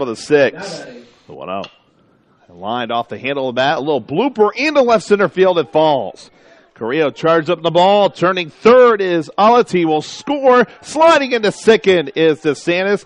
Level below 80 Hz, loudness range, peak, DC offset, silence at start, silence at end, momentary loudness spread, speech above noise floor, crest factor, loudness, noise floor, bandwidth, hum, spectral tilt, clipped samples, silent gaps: -58 dBFS; 8 LU; 0 dBFS; under 0.1%; 0 s; 0.1 s; 14 LU; 40 dB; 14 dB; -14 LUFS; -54 dBFS; 10.5 kHz; none; -5 dB/octave; under 0.1%; none